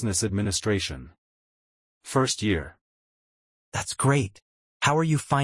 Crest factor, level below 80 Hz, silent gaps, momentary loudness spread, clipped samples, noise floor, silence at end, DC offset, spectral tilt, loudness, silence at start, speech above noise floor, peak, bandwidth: 20 dB; -52 dBFS; 1.18-2.01 s, 2.81-3.72 s, 4.42-4.80 s; 11 LU; under 0.1%; under -90 dBFS; 0 s; under 0.1%; -4.5 dB/octave; -26 LUFS; 0 s; over 65 dB; -8 dBFS; 12 kHz